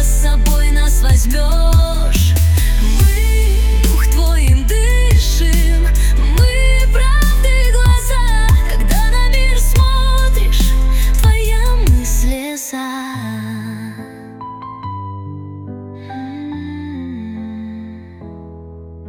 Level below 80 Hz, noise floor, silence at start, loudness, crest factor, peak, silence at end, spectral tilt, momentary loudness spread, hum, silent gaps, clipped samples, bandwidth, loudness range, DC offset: -12 dBFS; -33 dBFS; 0 s; -15 LUFS; 10 dB; -2 dBFS; 0 s; -4.5 dB/octave; 17 LU; none; none; under 0.1%; 18 kHz; 14 LU; under 0.1%